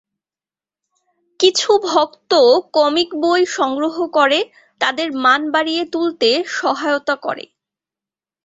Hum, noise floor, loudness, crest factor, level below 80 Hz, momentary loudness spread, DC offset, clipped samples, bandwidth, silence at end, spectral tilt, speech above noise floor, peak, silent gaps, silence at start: none; under -90 dBFS; -16 LUFS; 16 dB; -66 dBFS; 7 LU; under 0.1%; under 0.1%; 8 kHz; 1 s; -1.5 dB/octave; over 74 dB; -2 dBFS; none; 1.4 s